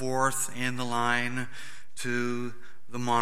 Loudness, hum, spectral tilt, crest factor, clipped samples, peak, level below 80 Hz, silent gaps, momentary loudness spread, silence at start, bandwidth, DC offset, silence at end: -30 LUFS; none; -3.5 dB/octave; 20 dB; under 0.1%; -10 dBFS; -66 dBFS; none; 14 LU; 0 s; 16 kHz; 2%; 0 s